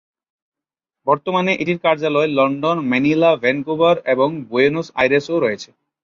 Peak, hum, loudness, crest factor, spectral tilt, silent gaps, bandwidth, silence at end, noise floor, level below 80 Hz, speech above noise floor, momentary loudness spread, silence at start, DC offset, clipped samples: -2 dBFS; none; -17 LUFS; 16 dB; -6.5 dB/octave; none; 7.2 kHz; 0.4 s; -87 dBFS; -60 dBFS; 70 dB; 5 LU; 1.05 s; under 0.1%; under 0.1%